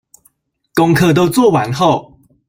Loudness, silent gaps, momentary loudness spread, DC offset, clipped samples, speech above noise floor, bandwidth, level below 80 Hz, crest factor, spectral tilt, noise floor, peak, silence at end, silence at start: -13 LUFS; none; 7 LU; under 0.1%; under 0.1%; 46 dB; 16.5 kHz; -46 dBFS; 14 dB; -6 dB/octave; -57 dBFS; 0 dBFS; 0.45 s; 0.75 s